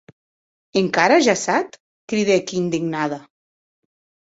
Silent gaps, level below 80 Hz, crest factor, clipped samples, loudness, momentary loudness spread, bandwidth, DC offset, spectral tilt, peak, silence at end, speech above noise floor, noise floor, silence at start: 1.80-2.08 s; -64 dBFS; 20 dB; under 0.1%; -19 LUFS; 11 LU; 8 kHz; under 0.1%; -4.5 dB/octave; -2 dBFS; 1 s; over 71 dB; under -90 dBFS; 0.75 s